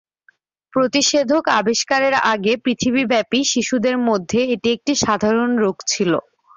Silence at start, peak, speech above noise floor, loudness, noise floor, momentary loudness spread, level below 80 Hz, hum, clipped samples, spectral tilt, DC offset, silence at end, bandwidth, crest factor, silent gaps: 0.75 s; -4 dBFS; 41 dB; -18 LUFS; -58 dBFS; 4 LU; -56 dBFS; none; under 0.1%; -3 dB/octave; under 0.1%; 0.35 s; 7.6 kHz; 16 dB; none